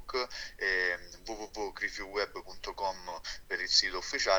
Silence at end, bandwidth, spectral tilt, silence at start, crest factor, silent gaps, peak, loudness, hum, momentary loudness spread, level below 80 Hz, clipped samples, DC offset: 0 s; over 20 kHz; -0.5 dB/octave; 0 s; 22 dB; none; -12 dBFS; -33 LUFS; none; 15 LU; -54 dBFS; under 0.1%; under 0.1%